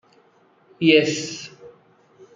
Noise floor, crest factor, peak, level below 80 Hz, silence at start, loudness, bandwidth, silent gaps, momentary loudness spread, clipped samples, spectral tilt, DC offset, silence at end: -58 dBFS; 22 dB; -2 dBFS; -68 dBFS; 0.8 s; -19 LUFS; 7.8 kHz; none; 20 LU; under 0.1%; -4 dB/octave; under 0.1%; 0.65 s